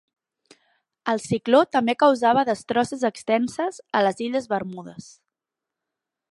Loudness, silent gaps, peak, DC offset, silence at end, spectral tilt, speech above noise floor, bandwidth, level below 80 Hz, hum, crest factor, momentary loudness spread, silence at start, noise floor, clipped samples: -22 LUFS; none; -4 dBFS; under 0.1%; 1.3 s; -5 dB/octave; 65 dB; 11.5 kHz; -68 dBFS; none; 20 dB; 13 LU; 1.05 s; -87 dBFS; under 0.1%